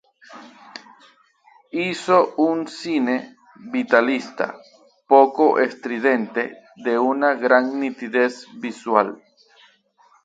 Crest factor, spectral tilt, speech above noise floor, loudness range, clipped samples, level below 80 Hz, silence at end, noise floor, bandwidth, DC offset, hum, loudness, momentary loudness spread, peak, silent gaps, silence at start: 22 dB; -5 dB/octave; 38 dB; 4 LU; under 0.1%; -74 dBFS; 1.1 s; -57 dBFS; 9.2 kHz; under 0.1%; none; -20 LUFS; 14 LU; 0 dBFS; none; 0.3 s